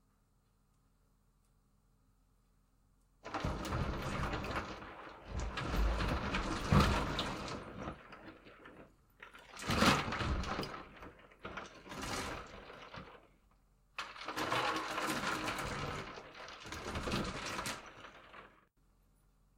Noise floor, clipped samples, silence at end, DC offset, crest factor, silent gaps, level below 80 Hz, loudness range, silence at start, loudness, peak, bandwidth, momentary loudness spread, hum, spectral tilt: -73 dBFS; under 0.1%; 1.1 s; under 0.1%; 26 dB; none; -48 dBFS; 9 LU; 3.25 s; -38 LUFS; -14 dBFS; 16 kHz; 22 LU; none; -4.5 dB/octave